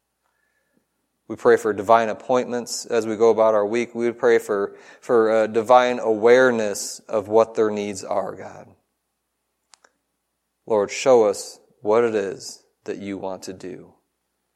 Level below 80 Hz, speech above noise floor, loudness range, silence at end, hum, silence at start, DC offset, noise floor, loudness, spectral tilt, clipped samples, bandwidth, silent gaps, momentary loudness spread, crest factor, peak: -72 dBFS; 56 dB; 7 LU; 0.7 s; none; 1.3 s; under 0.1%; -76 dBFS; -20 LUFS; -4 dB/octave; under 0.1%; 14 kHz; none; 18 LU; 20 dB; 0 dBFS